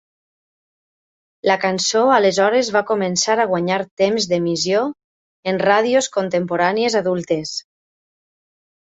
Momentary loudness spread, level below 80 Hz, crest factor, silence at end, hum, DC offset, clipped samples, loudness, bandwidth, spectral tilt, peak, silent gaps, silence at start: 8 LU; -62 dBFS; 18 dB; 1.25 s; none; under 0.1%; under 0.1%; -18 LUFS; 8.2 kHz; -3.5 dB/octave; -2 dBFS; 3.91-3.97 s, 5.04-5.43 s; 1.45 s